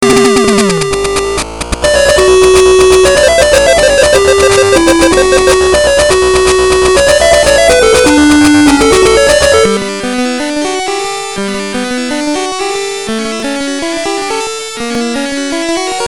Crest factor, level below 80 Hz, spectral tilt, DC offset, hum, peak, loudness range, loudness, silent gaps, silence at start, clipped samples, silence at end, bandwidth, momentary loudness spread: 8 dB; -26 dBFS; -3 dB/octave; 2%; none; 0 dBFS; 9 LU; -8 LUFS; none; 0 s; 0.3%; 0 s; 18.5 kHz; 10 LU